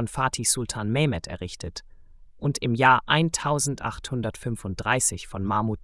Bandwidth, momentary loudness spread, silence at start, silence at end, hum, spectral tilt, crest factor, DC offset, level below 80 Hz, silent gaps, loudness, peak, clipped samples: 12 kHz; 15 LU; 0 s; 0.05 s; none; -4 dB/octave; 20 dB; under 0.1%; -48 dBFS; none; -25 LUFS; -6 dBFS; under 0.1%